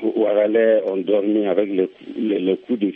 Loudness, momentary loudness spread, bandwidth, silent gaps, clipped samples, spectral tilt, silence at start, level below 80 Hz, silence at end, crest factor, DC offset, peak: -19 LUFS; 7 LU; 3.9 kHz; none; under 0.1%; -9.5 dB/octave; 0 s; -72 dBFS; 0 s; 14 dB; under 0.1%; -4 dBFS